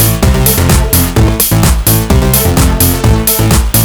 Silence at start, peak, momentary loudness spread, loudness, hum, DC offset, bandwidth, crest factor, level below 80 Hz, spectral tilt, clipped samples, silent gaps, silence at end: 0 s; 0 dBFS; 1 LU; -8 LUFS; none; under 0.1%; over 20 kHz; 8 dB; -14 dBFS; -4.5 dB/octave; 0.4%; none; 0 s